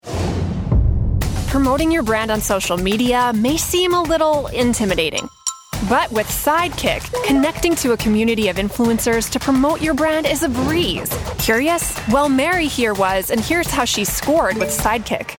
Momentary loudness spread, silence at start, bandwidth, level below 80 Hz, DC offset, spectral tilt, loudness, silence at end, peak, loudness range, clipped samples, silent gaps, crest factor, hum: 5 LU; 0.05 s; 19.5 kHz; -30 dBFS; under 0.1%; -4 dB/octave; -18 LUFS; 0.05 s; -2 dBFS; 1 LU; under 0.1%; none; 14 dB; none